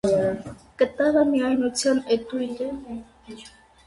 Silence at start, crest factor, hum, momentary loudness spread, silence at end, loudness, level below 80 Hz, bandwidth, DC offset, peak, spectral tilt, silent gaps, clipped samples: 0.05 s; 16 dB; none; 22 LU; 0.4 s; -23 LUFS; -54 dBFS; 11.5 kHz; under 0.1%; -8 dBFS; -4.5 dB/octave; none; under 0.1%